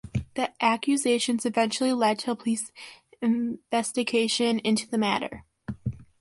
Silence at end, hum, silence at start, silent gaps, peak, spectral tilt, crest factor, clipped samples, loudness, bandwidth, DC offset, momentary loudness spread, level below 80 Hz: 0.2 s; none; 0.05 s; none; -8 dBFS; -4 dB/octave; 18 dB; under 0.1%; -26 LUFS; 11.5 kHz; under 0.1%; 13 LU; -54 dBFS